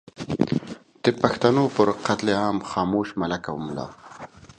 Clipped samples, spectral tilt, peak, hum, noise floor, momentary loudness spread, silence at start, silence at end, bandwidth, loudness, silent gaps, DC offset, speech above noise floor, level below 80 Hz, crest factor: under 0.1%; -6 dB/octave; -2 dBFS; none; -43 dBFS; 18 LU; 0.2 s; 0.05 s; 10 kHz; -24 LUFS; none; under 0.1%; 20 dB; -54 dBFS; 22 dB